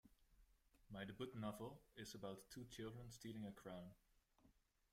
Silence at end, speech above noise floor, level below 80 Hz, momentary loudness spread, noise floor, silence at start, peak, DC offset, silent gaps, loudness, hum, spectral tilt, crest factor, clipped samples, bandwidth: 0.35 s; 24 dB; -74 dBFS; 7 LU; -78 dBFS; 0.05 s; -38 dBFS; under 0.1%; none; -55 LUFS; none; -5.5 dB/octave; 20 dB; under 0.1%; 16 kHz